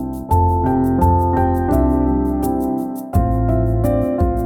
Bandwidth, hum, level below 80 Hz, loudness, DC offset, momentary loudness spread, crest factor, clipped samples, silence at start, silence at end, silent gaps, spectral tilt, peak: 17.5 kHz; none; -24 dBFS; -17 LUFS; under 0.1%; 4 LU; 14 dB; under 0.1%; 0 s; 0 s; none; -10 dB/octave; -2 dBFS